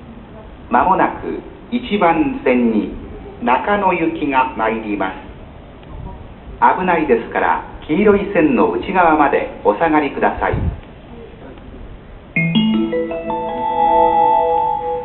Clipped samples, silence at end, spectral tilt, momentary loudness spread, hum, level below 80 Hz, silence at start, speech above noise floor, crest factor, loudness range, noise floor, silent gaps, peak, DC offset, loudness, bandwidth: under 0.1%; 0 s; -10.5 dB/octave; 23 LU; none; -36 dBFS; 0 s; 21 dB; 16 dB; 5 LU; -36 dBFS; none; 0 dBFS; under 0.1%; -16 LUFS; 4.2 kHz